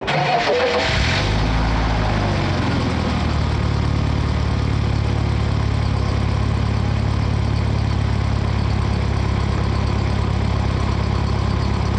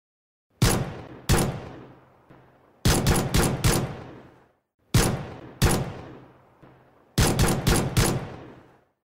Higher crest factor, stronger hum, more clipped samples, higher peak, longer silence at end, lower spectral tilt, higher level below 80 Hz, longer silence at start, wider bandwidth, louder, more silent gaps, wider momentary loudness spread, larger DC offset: about the same, 12 dB vs 16 dB; neither; neither; about the same, -8 dBFS vs -10 dBFS; second, 0 s vs 0.5 s; first, -6.5 dB/octave vs -4.5 dB/octave; first, -24 dBFS vs -34 dBFS; second, 0 s vs 0.6 s; second, 9 kHz vs 16.5 kHz; first, -20 LUFS vs -24 LUFS; second, none vs 4.74-4.79 s; second, 3 LU vs 19 LU; neither